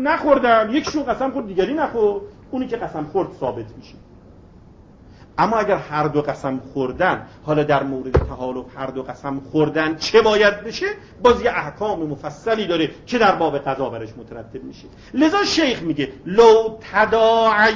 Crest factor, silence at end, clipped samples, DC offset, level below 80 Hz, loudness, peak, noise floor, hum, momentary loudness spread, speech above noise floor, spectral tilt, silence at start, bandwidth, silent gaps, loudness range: 20 dB; 0 s; under 0.1%; under 0.1%; -40 dBFS; -19 LUFS; 0 dBFS; -45 dBFS; none; 14 LU; 26 dB; -5.5 dB/octave; 0 s; 7.6 kHz; none; 6 LU